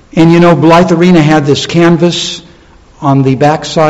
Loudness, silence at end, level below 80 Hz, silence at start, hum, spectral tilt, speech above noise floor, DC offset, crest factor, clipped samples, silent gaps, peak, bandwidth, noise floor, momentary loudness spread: -7 LUFS; 0 s; -38 dBFS; 0.15 s; none; -6 dB/octave; 32 dB; under 0.1%; 8 dB; 4%; none; 0 dBFS; 8.2 kHz; -38 dBFS; 9 LU